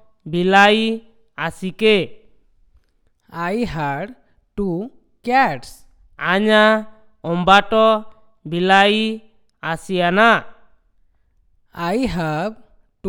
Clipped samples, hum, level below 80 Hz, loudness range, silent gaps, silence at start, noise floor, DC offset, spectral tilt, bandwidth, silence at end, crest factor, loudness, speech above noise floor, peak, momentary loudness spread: under 0.1%; none; -46 dBFS; 7 LU; none; 0.25 s; -60 dBFS; under 0.1%; -5.5 dB/octave; 17.5 kHz; 0 s; 20 dB; -17 LUFS; 44 dB; 0 dBFS; 17 LU